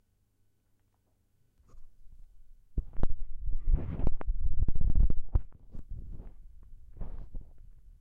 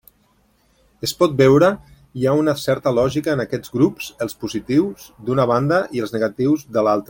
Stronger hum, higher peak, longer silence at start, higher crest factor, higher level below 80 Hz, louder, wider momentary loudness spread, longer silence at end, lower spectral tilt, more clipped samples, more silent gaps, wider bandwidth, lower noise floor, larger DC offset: neither; second, -14 dBFS vs -2 dBFS; first, 1.75 s vs 1.05 s; about the same, 14 dB vs 16 dB; first, -34 dBFS vs -52 dBFS; second, -37 LUFS vs -19 LUFS; first, 22 LU vs 12 LU; first, 0.4 s vs 0.05 s; first, -10.5 dB/octave vs -6.5 dB/octave; neither; neither; second, 1.6 kHz vs 17 kHz; first, -72 dBFS vs -60 dBFS; neither